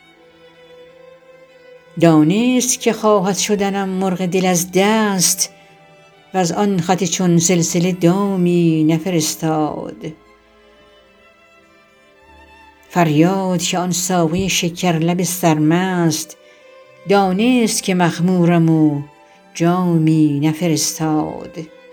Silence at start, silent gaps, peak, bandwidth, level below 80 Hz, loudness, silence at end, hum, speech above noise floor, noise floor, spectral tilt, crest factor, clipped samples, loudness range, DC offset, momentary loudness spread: 1.95 s; none; 0 dBFS; over 20 kHz; -54 dBFS; -16 LUFS; 0.25 s; none; 34 dB; -50 dBFS; -5 dB/octave; 16 dB; under 0.1%; 5 LU; under 0.1%; 9 LU